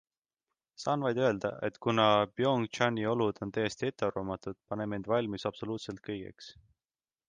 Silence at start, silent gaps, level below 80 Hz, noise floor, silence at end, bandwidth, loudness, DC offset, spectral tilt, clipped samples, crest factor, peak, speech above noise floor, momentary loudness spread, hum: 0.8 s; none; -64 dBFS; under -90 dBFS; 0.75 s; 9.6 kHz; -32 LUFS; under 0.1%; -5.5 dB/octave; under 0.1%; 20 dB; -12 dBFS; over 58 dB; 13 LU; none